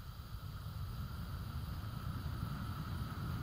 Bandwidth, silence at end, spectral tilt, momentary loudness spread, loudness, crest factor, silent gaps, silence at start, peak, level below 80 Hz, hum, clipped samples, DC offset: 16 kHz; 0 s; -6.5 dB/octave; 5 LU; -44 LUFS; 14 dB; none; 0 s; -28 dBFS; -50 dBFS; none; under 0.1%; under 0.1%